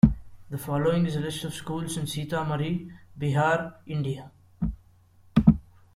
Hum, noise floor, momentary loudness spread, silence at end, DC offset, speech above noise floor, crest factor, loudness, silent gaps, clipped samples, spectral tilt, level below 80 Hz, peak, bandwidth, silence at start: none; -57 dBFS; 12 LU; 0.35 s; under 0.1%; 29 dB; 24 dB; -27 LUFS; none; under 0.1%; -6.5 dB/octave; -42 dBFS; -4 dBFS; 15.5 kHz; 0.05 s